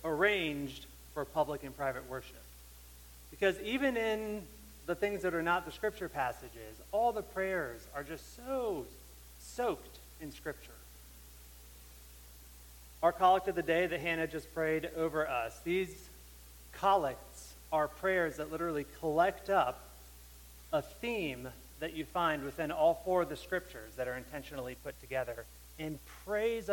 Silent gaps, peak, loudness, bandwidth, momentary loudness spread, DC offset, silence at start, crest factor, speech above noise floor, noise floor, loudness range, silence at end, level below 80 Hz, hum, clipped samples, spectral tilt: none; -14 dBFS; -35 LUFS; 17.5 kHz; 23 LU; under 0.1%; 0 s; 22 dB; 19 dB; -54 dBFS; 8 LU; 0 s; -56 dBFS; 60 Hz at -55 dBFS; under 0.1%; -5 dB/octave